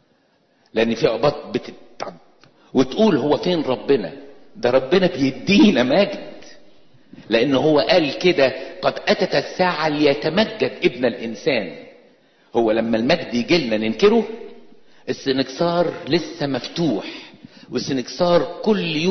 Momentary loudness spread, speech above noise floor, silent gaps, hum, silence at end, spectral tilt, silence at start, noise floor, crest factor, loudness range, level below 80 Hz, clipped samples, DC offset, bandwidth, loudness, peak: 13 LU; 42 dB; none; none; 0 s; -5.5 dB/octave; 0.75 s; -61 dBFS; 16 dB; 4 LU; -54 dBFS; under 0.1%; under 0.1%; 6.4 kHz; -19 LUFS; -4 dBFS